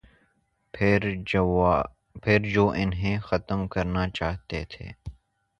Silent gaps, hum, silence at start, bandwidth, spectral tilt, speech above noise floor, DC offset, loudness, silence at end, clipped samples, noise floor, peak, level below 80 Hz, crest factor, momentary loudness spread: none; none; 0.75 s; 7.6 kHz; -7.5 dB/octave; 45 dB; under 0.1%; -26 LUFS; 0.5 s; under 0.1%; -70 dBFS; -6 dBFS; -42 dBFS; 20 dB; 17 LU